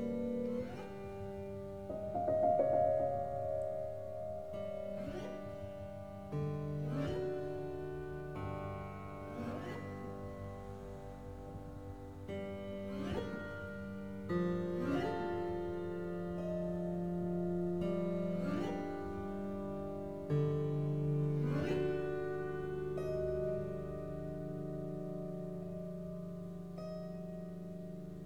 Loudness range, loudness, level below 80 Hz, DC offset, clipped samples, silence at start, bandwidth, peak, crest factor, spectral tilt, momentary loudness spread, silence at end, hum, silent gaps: 9 LU; -40 LUFS; -58 dBFS; 0.2%; under 0.1%; 0 s; 15.5 kHz; -20 dBFS; 18 dB; -8.5 dB/octave; 11 LU; 0 s; none; none